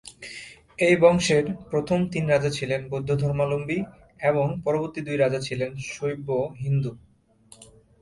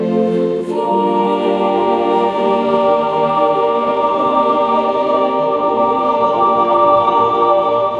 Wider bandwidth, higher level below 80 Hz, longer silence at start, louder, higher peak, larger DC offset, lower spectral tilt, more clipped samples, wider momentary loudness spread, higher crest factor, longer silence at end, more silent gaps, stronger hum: first, 11.5 kHz vs 9.2 kHz; about the same, -54 dBFS vs -54 dBFS; about the same, 0.05 s vs 0 s; second, -24 LUFS vs -14 LUFS; second, -4 dBFS vs 0 dBFS; neither; second, -6 dB/octave vs -7.5 dB/octave; neither; first, 12 LU vs 3 LU; first, 20 dB vs 14 dB; first, 0.35 s vs 0 s; neither; neither